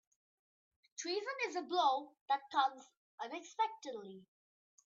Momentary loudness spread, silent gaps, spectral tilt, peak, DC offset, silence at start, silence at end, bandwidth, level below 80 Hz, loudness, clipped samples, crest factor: 18 LU; 2.21-2.26 s, 2.97-3.18 s; 0.5 dB/octave; -20 dBFS; under 0.1%; 1 s; 0.65 s; 7.6 kHz; under -90 dBFS; -38 LUFS; under 0.1%; 22 dB